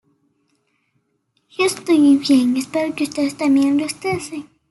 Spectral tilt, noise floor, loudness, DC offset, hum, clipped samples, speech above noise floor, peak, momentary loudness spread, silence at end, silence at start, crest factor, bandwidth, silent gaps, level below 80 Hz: -4 dB/octave; -68 dBFS; -17 LUFS; under 0.1%; none; under 0.1%; 51 dB; -4 dBFS; 12 LU; 0.3 s; 1.6 s; 14 dB; 12 kHz; none; -62 dBFS